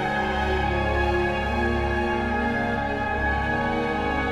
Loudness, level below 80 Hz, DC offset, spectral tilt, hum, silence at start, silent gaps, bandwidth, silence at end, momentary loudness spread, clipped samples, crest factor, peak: -24 LUFS; -32 dBFS; under 0.1%; -6.5 dB/octave; none; 0 s; none; 12 kHz; 0 s; 2 LU; under 0.1%; 12 dB; -12 dBFS